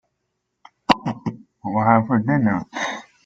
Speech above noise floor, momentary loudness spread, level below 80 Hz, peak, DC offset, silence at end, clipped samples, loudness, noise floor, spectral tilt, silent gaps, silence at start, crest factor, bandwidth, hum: 58 dB; 14 LU; -54 dBFS; -2 dBFS; under 0.1%; 0.25 s; under 0.1%; -21 LUFS; -76 dBFS; -6.5 dB/octave; none; 0.9 s; 20 dB; 7.8 kHz; none